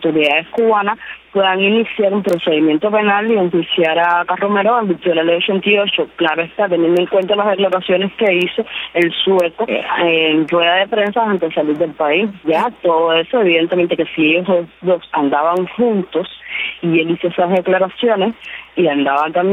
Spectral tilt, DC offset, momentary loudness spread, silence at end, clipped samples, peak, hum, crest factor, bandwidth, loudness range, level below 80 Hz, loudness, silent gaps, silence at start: -6.5 dB/octave; under 0.1%; 5 LU; 0 s; under 0.1%; -2 dBFS; none; 14 dB; 10.5 kHz; 2 LU; -58 dBFS; -15 LUFS; none; 0 s